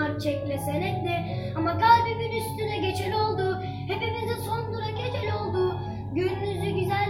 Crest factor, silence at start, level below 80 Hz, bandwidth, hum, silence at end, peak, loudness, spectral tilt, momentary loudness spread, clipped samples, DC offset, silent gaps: 20 dB; 0 s; -52 dBFS; 16.5 kHz; none; 0 s; -6 dBFS; -27 LUFS; -6.5 dB/octave; 9 LU; under 0.1%; under 0.1%; none